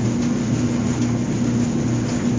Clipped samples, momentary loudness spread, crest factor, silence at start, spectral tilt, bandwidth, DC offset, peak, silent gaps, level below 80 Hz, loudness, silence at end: under 0.1%; 1 LU; 12 dB; 0 s; -6.5 dB/octave; 7.6 kHz; under 0.1%; -8 dBFS; none; -40 dBFS; -21 LUFS; 0 s